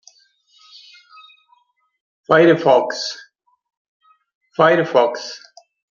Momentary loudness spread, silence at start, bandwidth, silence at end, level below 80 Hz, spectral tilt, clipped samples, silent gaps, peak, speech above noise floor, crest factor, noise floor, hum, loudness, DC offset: 19 LU; 2.3 s; 7.4 kHz; 0.6 s; -66 dBFS; -5 dB/octave; under 0.1%; 3.77-4.00 s, 4.35-4.41 s; 0 dBFS; 45 dB; 20 dB; -60 dBFS; none; -16 LUFS; under 0.1%